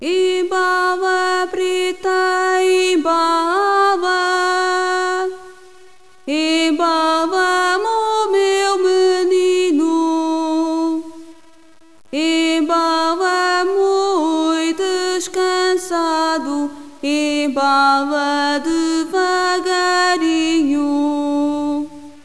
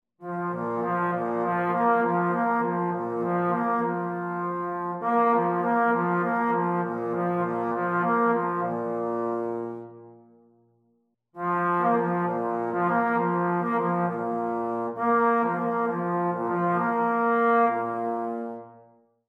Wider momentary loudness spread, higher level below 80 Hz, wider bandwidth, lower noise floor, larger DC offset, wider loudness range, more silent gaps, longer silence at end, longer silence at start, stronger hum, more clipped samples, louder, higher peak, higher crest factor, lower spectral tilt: about the same, 5 LU vs 7 LU; first, -58 dBFS vs -72 dBFS; first, 11 kHz vs 4.2 kHz; second, -48 dBFS vs -70 dBFS; first, 0.8% vs under 0.1%; about the same, 3 LU vs 4 LU; neither; second, 0.15 s vs 0.5 s; second, 0 s vs 0.2 s; neither; neither; first, -16 LUFS vs -26 LUFS; first, -4 dBFS vs -10 dBFS; about the same, 14 dB vs 16 dB; second, -1.5 dB/octave vs -9.5 dB/octave